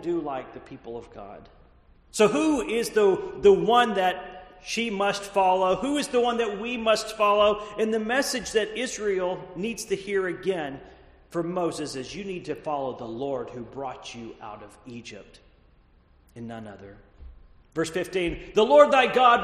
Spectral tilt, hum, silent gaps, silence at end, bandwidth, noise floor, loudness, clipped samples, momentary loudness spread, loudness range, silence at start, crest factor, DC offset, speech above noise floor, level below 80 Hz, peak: -4 dB/octave; none; none; 0 s; 13 kHz; -58 dBFS; -24 LUFS; under 0.1%; 21 LU; 15 LU; 0 s; 22 dB; under 0.1%; 33 dB; -54 dBFS; -2 dBFS